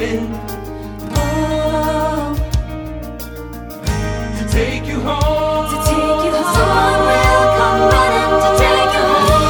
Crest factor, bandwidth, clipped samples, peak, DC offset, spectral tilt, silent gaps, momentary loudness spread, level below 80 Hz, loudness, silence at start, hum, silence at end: 14 dB; over 20 kHz; under 0.1%; 0 dBFS; under 0.1%; -5 dB/octave; none; 15 LU; -24 dBFS; -15 LUFS; 0 s; none; 0 s